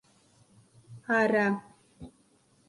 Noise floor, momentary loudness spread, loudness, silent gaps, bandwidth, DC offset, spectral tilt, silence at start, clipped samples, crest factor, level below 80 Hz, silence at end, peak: -65 dBFS; 26 LU; -27 LUFS; none; 11.5 kHz; under 0.1%; -6.5 dB/octave; 0.9 s; under 0.1%; 22 dB; -68 dBFS; 0.6 s; -10 dBFS